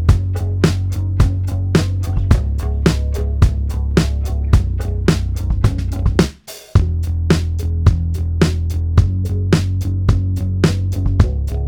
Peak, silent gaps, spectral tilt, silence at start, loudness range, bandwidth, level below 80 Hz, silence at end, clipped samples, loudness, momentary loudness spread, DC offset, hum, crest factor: 0 dBFS; none; -7 dB/octave; 0 s; 1 LU; 16.5 kHz; -20 dBFS; 0 s; under 0.1%; -18 LUFS; 4 LU; under 0.1%; none; 14 dB